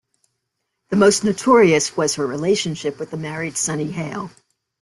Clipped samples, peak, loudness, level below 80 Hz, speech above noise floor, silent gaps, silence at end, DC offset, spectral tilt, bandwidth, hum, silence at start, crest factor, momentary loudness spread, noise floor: under 0.1%; -2 dBFS; -19 LUFS; -58 dBFS; 58 dB; none; 0.55 s; under 0.1%; -4 dB/octave; 12.5 kHz; none; 0.9 s; 18 dB; 14 LU; -76 dBFS